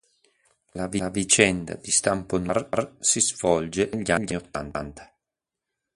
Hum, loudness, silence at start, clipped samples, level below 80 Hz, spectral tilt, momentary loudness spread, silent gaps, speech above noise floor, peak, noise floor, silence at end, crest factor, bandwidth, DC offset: none; -24 LUFS; 0.75 s; under 0.1%; -50 dBFS; -3 dB/octave; 14 LU; none; 62 dB; -2 dBFS; -87 dBFS; 0.9 s; 24 dB; 11.5 kHz; under 0.1%